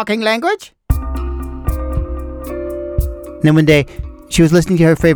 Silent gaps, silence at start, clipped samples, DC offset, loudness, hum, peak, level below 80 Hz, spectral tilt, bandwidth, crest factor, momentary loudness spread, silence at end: none; 0 s; under 0.1%; under 0.1%; -16 LUFS; none; 0 dBFS; -24 dBFS; -6.5 dB/octave; over 20 kHz; 14 dB; 14 LU; 0 s